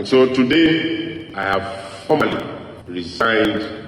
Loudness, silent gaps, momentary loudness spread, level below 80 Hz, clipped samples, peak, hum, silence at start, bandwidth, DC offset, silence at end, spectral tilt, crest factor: -18 LUFS; none; 16 LU; -50 dBFS; under 0.1%; -2 dBFS; none; 0 s; 12 kHz; under 0.1%; 0 s; -5.5 dB/octave; 16 dB